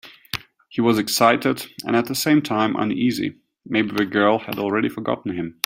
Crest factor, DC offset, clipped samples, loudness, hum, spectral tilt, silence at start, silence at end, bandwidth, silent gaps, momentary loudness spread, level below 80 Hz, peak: 22 dB; under 0.1%; under 0.1%; -21 LUFS; none; -4.5 dB/octave; 0.05 s; 0.15 s; 16.5 kHz; none; 12 LU; -60 dBFS; 0 dBFS